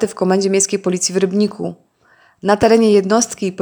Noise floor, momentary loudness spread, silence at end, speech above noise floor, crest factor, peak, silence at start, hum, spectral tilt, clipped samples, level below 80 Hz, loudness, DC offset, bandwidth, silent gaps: -53 dBFS; 9 LU; 0 s; 38 dB; 16 dB; 0 dBFS; 0 s; none; -4.5 dB/octave; under 0.1%; -52 dBFS; -15 LUFS; under 0.1%; over 20 kHz; none